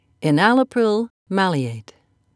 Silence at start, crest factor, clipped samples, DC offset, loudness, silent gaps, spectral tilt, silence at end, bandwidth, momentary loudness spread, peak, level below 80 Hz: 0.2 s; 20 dB; under 0.1%; under 0.1%; -19 LUFS; 1.10-1.26 s; -6.5 dB/octave; 0.55 s; 11 kHz; 11 LU; 0 dBFS; -70 dBFS